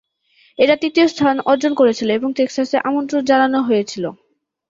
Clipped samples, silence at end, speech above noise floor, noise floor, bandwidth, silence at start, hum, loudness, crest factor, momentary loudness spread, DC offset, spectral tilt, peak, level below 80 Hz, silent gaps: under 0.1%; 0.55 s; 40 dB; -56 dBFS; 7.8 kHz; 0.6 s; none; -16 LUFS; 16 dB; 6 LU; under 0.1%; -4.5 dB/octave; -2 dBFS; -62 dBFS; none